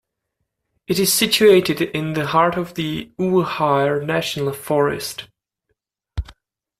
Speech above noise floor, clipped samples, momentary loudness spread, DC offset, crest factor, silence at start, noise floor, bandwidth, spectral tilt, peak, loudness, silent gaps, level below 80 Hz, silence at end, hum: 58 dB; under 0.1%; 16 LU; under 0.1%; 18 dB; 0.9 s; -76 dBFS; 16 kHz; -4 dB/octave; -2 dBFS; -18 LUFS; none; -44 dBFS; 0.5 s; none